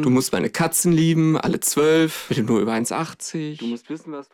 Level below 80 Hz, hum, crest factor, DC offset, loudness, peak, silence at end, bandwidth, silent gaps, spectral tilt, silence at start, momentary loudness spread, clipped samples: -56 dBFS; none; 12 dB; under 0.1%; -20 LUFS; -8 dBFS; 0.1 s; 18 kHz; none; -5 dB/octave; 0 s; 12 LU; under 0.1%